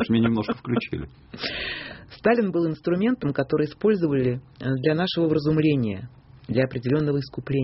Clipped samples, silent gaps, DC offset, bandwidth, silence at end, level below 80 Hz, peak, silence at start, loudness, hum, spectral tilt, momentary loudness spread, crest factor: under 0.1%; none; under 0.1%; 6 kHz; 0 s; -52 dBFS; -6 dBFS; 0 s; -24 LUFS; none; -6 dB/octave; 11 LU; 18 dB